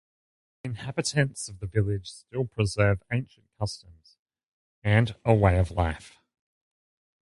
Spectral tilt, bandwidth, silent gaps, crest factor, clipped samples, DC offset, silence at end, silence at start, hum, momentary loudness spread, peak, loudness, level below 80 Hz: -6 dB/octave; 11.5 kHz; 4.19-4.26 s, 4.43-4.82 s; 24 dB; under 0.1%; under 0.1%; 1.15 s; 0.65 s; none; 14 LU; -4 dBFS; -27 LUFS; -42 dBFS